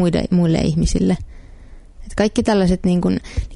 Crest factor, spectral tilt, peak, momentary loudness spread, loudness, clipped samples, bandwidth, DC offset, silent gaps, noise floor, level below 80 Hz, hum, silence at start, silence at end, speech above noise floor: 16 dB; -6.5 dB/octave; -2 dBFS; 8 LU; -18 LUFS; under 0.1%; 11 kHz; under 0.1%; none; -39 dBFS; -30 dBFS; none; 0 s; 0 s; 22 dB